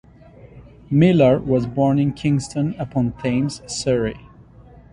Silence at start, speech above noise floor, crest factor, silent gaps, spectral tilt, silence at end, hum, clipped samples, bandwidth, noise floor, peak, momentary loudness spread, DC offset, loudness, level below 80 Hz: 0.45 s; 27 dB; 18 dB; none; -7 dB/octave; 0.75 s; none; under 0.1%; 11 kHz; -45 dBFS; -2 dBFS; 9 LU; under 0.1%; -19 LUFS; -46 dBFS